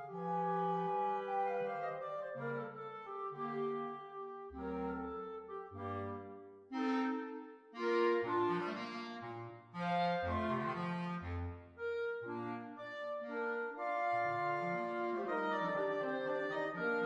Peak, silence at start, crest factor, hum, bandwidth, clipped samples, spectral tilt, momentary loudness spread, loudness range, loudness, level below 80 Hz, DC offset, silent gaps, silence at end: -24 dBFS; 0 s; 16 dB; none; 9.6 kHz; under 0.1%; -7.5 dB/octave; 12 LU; 6 LU; -39 LUFS; -66 dBFS; under 0.1%; none; 0 s